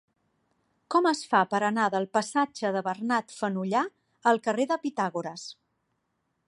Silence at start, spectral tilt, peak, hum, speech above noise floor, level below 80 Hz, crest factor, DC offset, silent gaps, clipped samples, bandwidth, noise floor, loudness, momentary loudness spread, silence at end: 0.9 s; -4.5 dB/octave; -8 dBFS; none; 50 dB; -80 dBFS; 20 dB; under 0.1%; none; under 0.1%; 11.5 kHz; -77 dBFS; -27 LUFS; 8 LU; 0.95 s